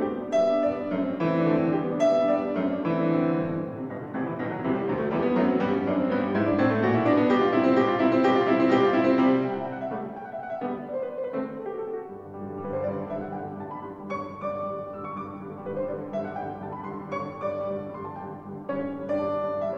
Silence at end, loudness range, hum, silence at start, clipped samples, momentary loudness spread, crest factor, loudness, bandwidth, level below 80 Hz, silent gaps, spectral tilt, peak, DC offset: 0 s; 11 LU; none; 0 s; under 0.1%; 14 LU; 16 dB; -26 LUFS; 7.4 kHz; -62 dBFS; none; -8 dB/octave; -10 dBFS; under 0.1%